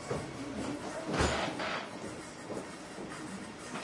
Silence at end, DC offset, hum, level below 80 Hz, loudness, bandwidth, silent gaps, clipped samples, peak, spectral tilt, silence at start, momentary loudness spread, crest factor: 0 s; under 0.1%; none; -52 dBFS; -38 LUFS; 11.5 kHz; none; under 0.1%; -16 dBFS; -4.5 dB/octave; 0 s; 12 LU; 22 dB